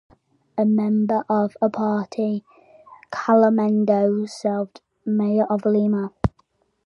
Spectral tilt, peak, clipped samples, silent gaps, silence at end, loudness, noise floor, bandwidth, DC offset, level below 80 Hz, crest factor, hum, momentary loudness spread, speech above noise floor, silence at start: -8 dB/octave; -2 dBFS; under 0.1%; none; 0.6 s; -21 LUFS; -64 dBFS; 8.6 kHz; under 0.1%; -48 dBFS; 18 dB; none; 10 LU; 45 dB; 0.55 s